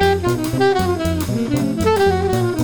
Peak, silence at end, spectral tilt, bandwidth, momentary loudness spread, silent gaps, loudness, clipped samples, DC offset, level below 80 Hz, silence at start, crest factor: -4 dBFS; 0 s; -6 dB/octave; over 20 kHz; 4 LU; none; -18 LUFS; under 0.1%; 0.8%; -36 dBFS; 0 s; 14 dB